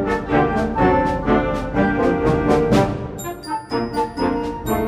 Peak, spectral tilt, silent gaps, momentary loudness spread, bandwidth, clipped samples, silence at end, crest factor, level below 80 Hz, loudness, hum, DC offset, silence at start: -4 dBFS; -7 dB/octave; none; 9 LU; 15.5 kHz; under 0.1%; 0 s; 16 dB; -34 dBFS; -19 LUFS; none; under 0.1%; 0 s